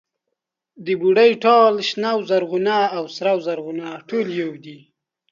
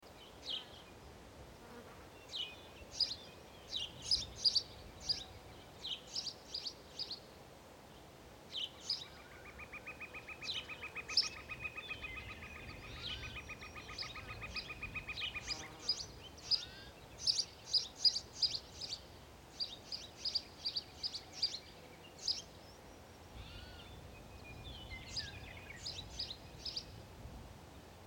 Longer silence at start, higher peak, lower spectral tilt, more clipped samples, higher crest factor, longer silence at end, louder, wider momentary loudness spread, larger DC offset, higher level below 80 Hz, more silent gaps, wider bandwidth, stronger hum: first, 0.8 s vs 0 s; first, -2 dBFS vs -18 dBFS; first, -5.5 dB/octave vs -1.5 dB/octave; neither; second, 16 dB vs 26 dB; first, 0.55 s vs 0 s; first, -19 LUFS vs -40 LUFS; second, 15 LU vs 20 LU; neither; second, -72 dBFS vs -60 dBFS; neither; second, 7.4 kHz vs 17 kHz; neither